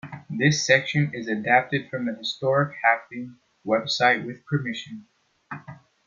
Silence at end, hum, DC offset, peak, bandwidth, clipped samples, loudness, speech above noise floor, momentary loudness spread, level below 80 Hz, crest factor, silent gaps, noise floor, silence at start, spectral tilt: 0.3 s; none; under 0.1%; -2 dBFS; 7.6 kHz; under 0.1%; -23 LUFS; 21 dB; 19 LU; -68 dBFS; 22 dB; none; -45 dBFS; 0.05 s; -4.5 dB/octave